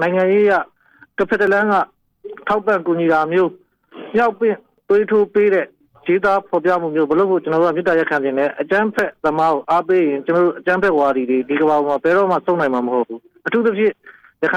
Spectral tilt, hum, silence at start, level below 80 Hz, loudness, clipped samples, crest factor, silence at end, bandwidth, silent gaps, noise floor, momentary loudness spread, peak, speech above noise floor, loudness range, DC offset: -7.5 dB/octave; none; 0 s; -58 dBFS; -17 LUFS; under 0.1%; 10 dB; 0 s; 8.4 kHz; none; -37 dBFS; 7 LU; -6 dBFS; 20 dB; 2 LU; under 0.1%